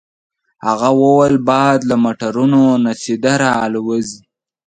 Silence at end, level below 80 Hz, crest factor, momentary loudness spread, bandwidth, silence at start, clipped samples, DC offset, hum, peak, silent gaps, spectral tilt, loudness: 0.5 s; -54 dBFS; 14 dB; 9 LU; 9.4 kHz; 0.65 s; under 0.1%; under 0.1%; none; 0 dBFS; none; -6 dB/octave; -14 LUFS